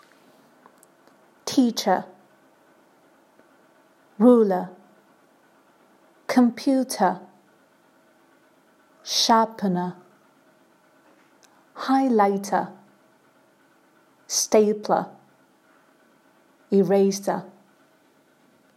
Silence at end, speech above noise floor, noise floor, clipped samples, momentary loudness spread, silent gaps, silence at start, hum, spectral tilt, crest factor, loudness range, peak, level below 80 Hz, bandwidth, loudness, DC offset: 1.3 s; 39 dB; -60 dBFS; under 0.1%; 16 LU; none; 1.45 s; none; -4.5 dB/octave; 22 dB; 3 LU; -4 dBFS; -78 dBFS; 15.5 kHz; -22 LUFS; under 0.1%